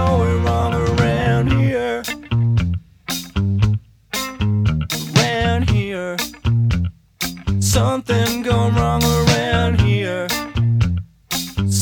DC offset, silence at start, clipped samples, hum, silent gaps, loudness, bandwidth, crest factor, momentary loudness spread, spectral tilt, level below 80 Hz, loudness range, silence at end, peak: under 0.1%; 0 s; under 0.1%; none; none; -19 LUFS; 19 kHz; 16 dB; 8 LU; -5.5 dB/octave; -30 dBFS; 3 LU; 0 s; 0 dBFS